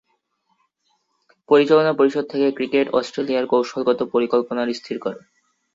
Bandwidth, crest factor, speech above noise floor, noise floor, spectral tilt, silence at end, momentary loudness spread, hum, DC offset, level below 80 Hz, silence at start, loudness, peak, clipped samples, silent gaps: 7.8 kHz; 18 dB; 50 dB; -69 dBFS; -6 dB/octave; 0.55 s; 12 LU; none; under 0.1%; -66 dBFS; 1.5 s; -20 LUFS; -2 dBFS; under 0.1%; none